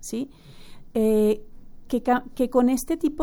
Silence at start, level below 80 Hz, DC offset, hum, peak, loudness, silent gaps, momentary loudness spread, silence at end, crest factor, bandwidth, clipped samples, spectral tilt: 0 s; -44 dBFS; under 0.1%; none; -8 dBFS; -24 LUFS; none; 11 LU; 0 s; 16 dB; over 20 kHz; under 0.1%; -5.5 dB/octave